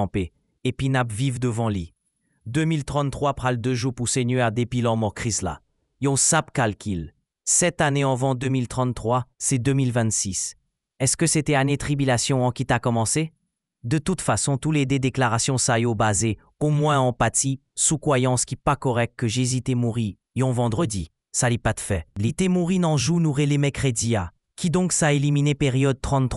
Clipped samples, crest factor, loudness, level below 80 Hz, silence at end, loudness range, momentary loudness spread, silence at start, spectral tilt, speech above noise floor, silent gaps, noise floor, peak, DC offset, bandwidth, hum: under 0.1%; 18 dB; -23 LUFS; -46 dBFS; 0 s; 3 LU; 8 LU; 0 s; -4.5 dB/octave; 48 dB; none; -71 dBFS; -4 dBFS; under 0.1%; 13.5 kHz; none